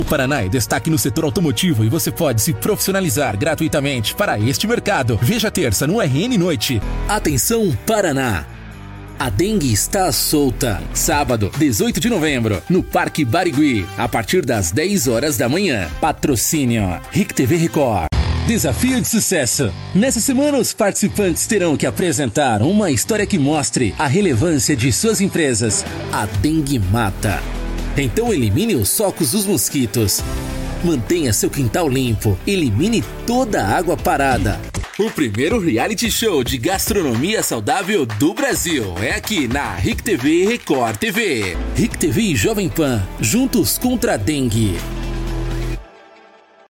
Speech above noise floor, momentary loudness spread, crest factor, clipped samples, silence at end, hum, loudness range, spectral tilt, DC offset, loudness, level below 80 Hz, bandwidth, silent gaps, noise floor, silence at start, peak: 30 dB; 5 LU; 12 dB; under 0.1%; 0.85 s; none; 2 LU; -4.5 dB/octave; under 0.1%; -17 LUFS; -32 dBFS; 17 kHz; none; -47 dBFS; 0 s; -4 dBFS